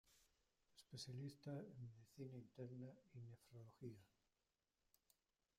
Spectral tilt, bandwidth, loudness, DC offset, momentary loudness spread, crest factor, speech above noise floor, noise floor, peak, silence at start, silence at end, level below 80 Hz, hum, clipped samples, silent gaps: -6 dB/octave; 15.5 kHz; -58 LUFS; under 0.1%; 8 LU; 18 dB; over 33 dB; under -90 dBFS; -42 dBFS; 0.05 s; 1.5 s; -86 dBFS; none; under 0.1%; none